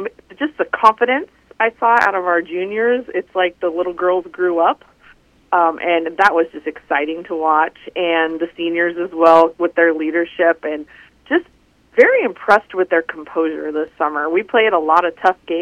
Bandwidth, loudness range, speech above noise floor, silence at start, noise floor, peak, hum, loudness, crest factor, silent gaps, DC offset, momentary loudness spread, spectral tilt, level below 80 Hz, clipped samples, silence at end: 9 kHz; 2 LU; 33 dB; 0 s; -50 dBFS; 0 dBFS; none; -16 LUFS; 16 dB; none; under 0.1%; 9 LU; -5 dB/octave; -58 dBFS; under 0.1%; 0 s